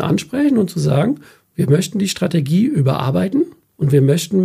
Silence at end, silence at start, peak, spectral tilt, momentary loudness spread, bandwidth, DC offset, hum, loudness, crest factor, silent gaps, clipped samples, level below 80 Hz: 0 s; 0 s; -2 dBFS; -6.5 dB/octave; 8 LU; 15.5 kHz; under 0.1%; none; -17 LUFS; 14 dB; none; under 0.1%; -54 dBFS